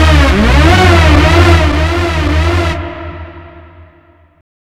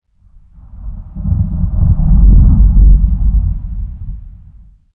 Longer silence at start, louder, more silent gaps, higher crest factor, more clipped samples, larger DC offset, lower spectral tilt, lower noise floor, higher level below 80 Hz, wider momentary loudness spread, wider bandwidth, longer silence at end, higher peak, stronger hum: second, 0 s vs 0.75 s; first, -9 LUFS vs -12 LUFS; neither; about the same, 10 dB vs 10 dB; first, 1% vs under 0.1%; neither; second, -6 dB/octave vs -15 dB/octave; about the same, -45 dBFS vs -43 dBFS; about the same, -14 dBFS vs -12 dBFS; second, 18 LU vs 21 LU; first, 13 kHz vs 1.3 kHz; first, 1.1 s vs 0.65 s; about the same, 0 dBFS vs 0 dBFS; neither